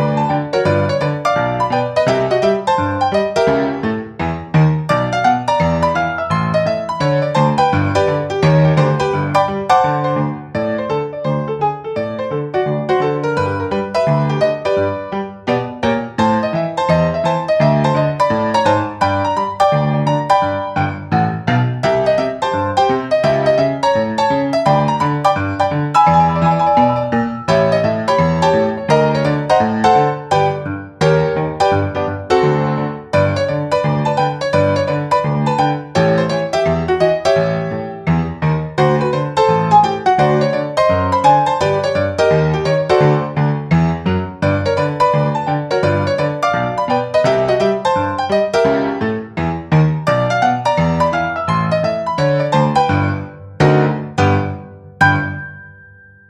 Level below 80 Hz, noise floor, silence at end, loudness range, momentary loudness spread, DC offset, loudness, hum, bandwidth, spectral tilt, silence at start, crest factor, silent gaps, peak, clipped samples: -42 dBFS; -43 dBFS; 0.6 s; 3 LU; 6 LU; under 0.1%; -15 LUFS; none; 10.5 kHz; -7 dB/octave; 0 s; 14 dB; none; 0 dBFS; under 0.1%